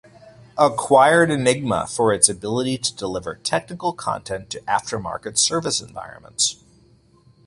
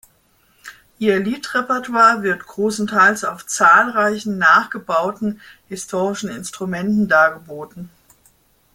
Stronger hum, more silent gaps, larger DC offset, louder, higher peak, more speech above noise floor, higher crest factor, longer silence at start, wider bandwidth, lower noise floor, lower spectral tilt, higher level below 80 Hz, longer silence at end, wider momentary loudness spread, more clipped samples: neither; neither; neither; second, -20 LUFS vs -17 LUFS; about the same, 0 dBFS vs -2 dBFS; second, 34 dB vs 41 dB; about the same, 22 dB vs 18 dB; second, 0.25 s vs 0.65 s; second, 11.5 kHz vs 16.5 kHz; about the same, -55 dBFS vs -58 dBFS; about the same, -3 dB/octave vs -4 dB/octave; first, -54 dBFS vs -60 dBFS; about the same, 0.95 s vs 0.9 s; second, 13 LU vs 18 LU; neither